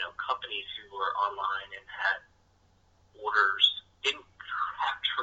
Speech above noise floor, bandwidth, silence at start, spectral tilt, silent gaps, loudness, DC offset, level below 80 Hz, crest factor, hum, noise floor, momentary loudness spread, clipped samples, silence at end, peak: 35 dB; 8.2 kHz; 0 s; 0 dB/octave; none; -29 LUFS; under 0.1%; -68 dBFS; 22 dB; none; -65 dBFS; 14 LU; under 0.1%; 0 s; -10 dBFS